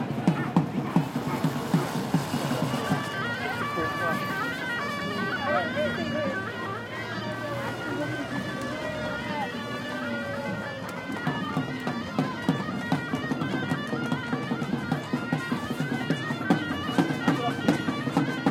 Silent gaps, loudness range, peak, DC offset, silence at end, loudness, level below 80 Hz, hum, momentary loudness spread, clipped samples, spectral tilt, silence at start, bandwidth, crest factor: none; 4 LU; -8 dBFS; under 0.1%; 0 s; -29 LUFS; -60 dBFS; none; 6 LU; under 0.1%; -6 dB/octave; 0 s; 16.5 kHz; 20 dB